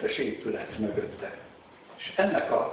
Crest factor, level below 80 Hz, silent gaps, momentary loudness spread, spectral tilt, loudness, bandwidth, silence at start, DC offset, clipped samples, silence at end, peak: 20 dB; -62 dBFS; none; 19 LU; -3.5 dB/octave; -30 LUFS; 4 kHz; 0 s; under 0.1%; under 0.1%; 0 s; -10 dBFS